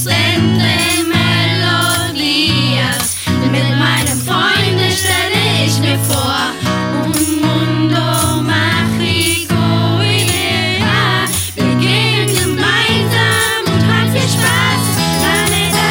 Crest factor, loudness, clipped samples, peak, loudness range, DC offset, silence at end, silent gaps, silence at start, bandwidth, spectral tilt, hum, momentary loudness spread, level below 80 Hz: 12 dB; -12 LUFS; under 0.1%; 0 dBFS; 2 LU; under 0.1%; 0 s; none; 0 s; 17.5 kHz; -4 dB/octave; none; 3 LU; -40 dBFS